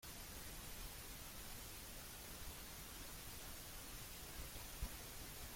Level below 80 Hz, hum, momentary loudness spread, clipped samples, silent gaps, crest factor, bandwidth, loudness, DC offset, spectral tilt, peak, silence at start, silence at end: -58 dBFS; none; 2 LU; under 0.1%; none; 20 dB; 16.5 kHz; -52 LUFS; under 0.1%; -2.5 dB/octave; -34 dBFS; 0 s; 0 s